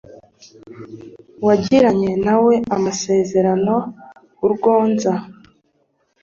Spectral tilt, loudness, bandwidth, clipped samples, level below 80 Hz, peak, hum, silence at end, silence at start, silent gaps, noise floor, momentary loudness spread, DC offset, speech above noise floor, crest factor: -6 dB/octave; -17 LUFS; 7.6 kHz; under 0.1%; -54 dBFS; -2 dBFS; none; 0.9 s; 0.1 s; none; -64 dBFS; 21 LU; under 0.1%; 48 dB; 16 dB